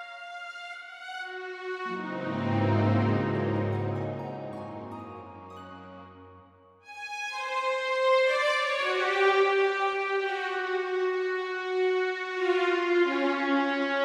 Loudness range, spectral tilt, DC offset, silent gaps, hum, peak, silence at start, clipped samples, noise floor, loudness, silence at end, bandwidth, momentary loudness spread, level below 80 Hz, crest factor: 11 LU; -6 dB/octave; under 0.1%; none; none; -12 dBFS; 0 s; under 0.1%; -56 dBFS; -28 LUFS; 0 s; 10.5 kHz; 17 LU; -70 dBFS; 16 dB